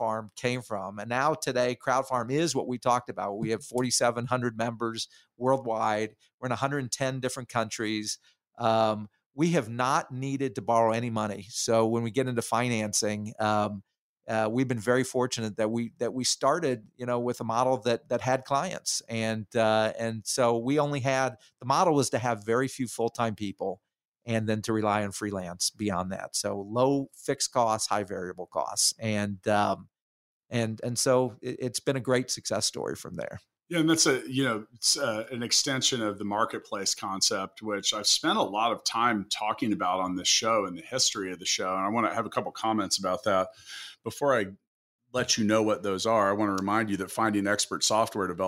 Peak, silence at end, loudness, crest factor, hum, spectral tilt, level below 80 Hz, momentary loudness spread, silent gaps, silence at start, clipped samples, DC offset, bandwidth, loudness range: -10 dBFS; 0 s; -28 LUFS; 18 dB; none; -3.5 dB/octave; -68 dBFS; 9 LU; 6.34-6.38 s, 9.26-9.30 s, 13.99-14.16 s, 24.05-24.12 s, 30.01-30.41 s, 44.67-44.99 s; 0 s; under 0.1%; under 0.1%; 16 kHz; 3 LU